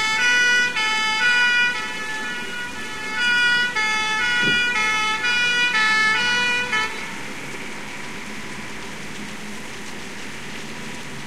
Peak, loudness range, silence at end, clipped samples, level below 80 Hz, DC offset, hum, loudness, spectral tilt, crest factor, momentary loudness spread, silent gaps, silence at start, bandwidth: -8 dBFS; 14 LU; 0 s; under 0.1%; -54 dBFS; 2%; none; -18 LUFS; -1 dB/octave; 14 dB; 16 LU; none; 0 s; 16 kHz